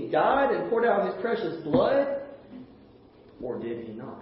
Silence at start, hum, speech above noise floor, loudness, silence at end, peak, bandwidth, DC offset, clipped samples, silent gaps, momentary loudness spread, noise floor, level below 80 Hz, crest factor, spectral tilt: 0 s; none; 27 dB; -26 LUFS; 0 s; -10 dBFS; 5.8 kHz; under 0.1%; under 0.1%; none; 19 LU; -53 dBFS; -60 dBFS; 16 dB; -4.5 dB/octave